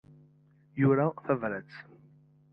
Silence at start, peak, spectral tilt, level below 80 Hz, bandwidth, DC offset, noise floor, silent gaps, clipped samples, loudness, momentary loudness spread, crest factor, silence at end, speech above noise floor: 0.75 s; -12 dBFS; -11.5 dB/octave; -72 dBFS; 5.4 kHz; under 0.1%; -62 dBFS; none; under 0.1%; -29 LUFS; 22 LU; 20 dB; 0.7 s; 33 dB